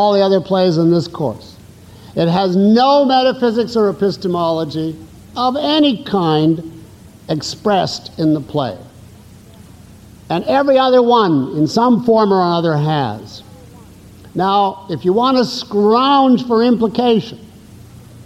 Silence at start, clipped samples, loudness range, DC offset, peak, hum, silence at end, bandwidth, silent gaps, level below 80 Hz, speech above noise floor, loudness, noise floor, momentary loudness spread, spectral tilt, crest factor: 0 s; under 0.1%; 5 LU; under 0.1%; -2 dBFS; none; 0.05 s; 14.5 kHz; none; -52 dBFS; 26 dB; -15 LUFS; -40 dBFS; 12 LU; -6.5 dB/octave; 12 dB